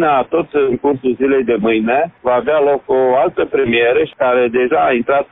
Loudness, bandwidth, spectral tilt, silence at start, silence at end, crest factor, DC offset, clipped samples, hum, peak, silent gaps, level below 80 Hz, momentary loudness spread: -14 LUFS; 3.9 kHz; -10 dB/octave; 0 s; 0.05 s; 12 dB; under 0.1%; under 0.1%; none; -2 dBFS; none; -50 dBFS; 3 LU